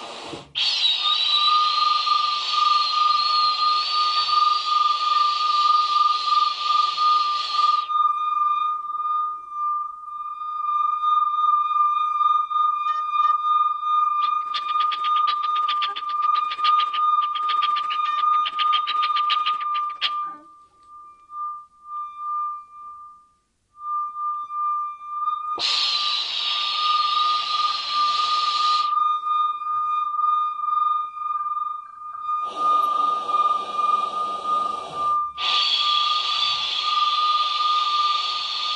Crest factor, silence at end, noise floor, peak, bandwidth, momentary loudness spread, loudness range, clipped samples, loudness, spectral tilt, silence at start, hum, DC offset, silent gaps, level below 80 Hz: 14 dB; 0 s; -64 dBFS; -8 dBFS; 9.8 kHz; 9 LU; 8 LU; under 0.1%; -21 LUFS; 1 dB/octave; 0 s; none; under 0.1%; none; -72 dBFS